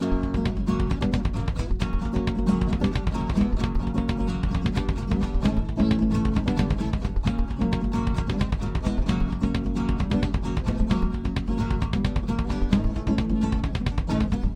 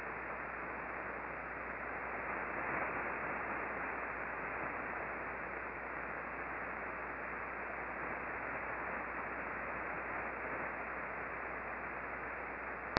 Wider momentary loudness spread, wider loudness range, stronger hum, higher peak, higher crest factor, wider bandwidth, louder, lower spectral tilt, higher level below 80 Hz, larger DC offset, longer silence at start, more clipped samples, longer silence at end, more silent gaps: about the same, 3 LU vs 3 LU; about the same, 1 LU vs 2 LU; neither; first, -6 dBFS vs -10 dBFS; second, 18 dB vs 32 dB; first, 9.8 kHz vs 5.6 kHz; first, -26 LUFS vs -41 LUFS; first, -7.5 dB/octave vs -3 dB/octave; first, -28 dBFS vs -60 dBFS; neither; about the same, 0 s vs 0 s; neither; about the same, 0 s vs 0 s; neither